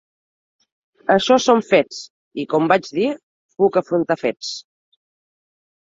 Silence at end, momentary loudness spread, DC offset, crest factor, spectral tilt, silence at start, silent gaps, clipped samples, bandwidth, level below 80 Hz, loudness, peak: 1.35 s; 16 LU; under 0.1%; 20 dB; -4.5 dB/octave; 1.1 s; 2.10-2.31 s, 3.23-3.49 s; under 0.1%; 7.8 kHz; -64 dBFS; -18 LUFS; 0 dBFS